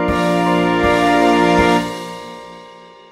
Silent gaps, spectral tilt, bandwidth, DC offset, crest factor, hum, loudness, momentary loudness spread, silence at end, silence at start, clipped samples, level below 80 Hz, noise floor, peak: none; -5.5 dB/octave; 15.5 kHz; under 0.1%; 16 dB; none; -14 LUFS; 18 LU; 0.35 s; 0 s; under 0.1%; -36 dBFS; -40 dBFS; 0 dBFS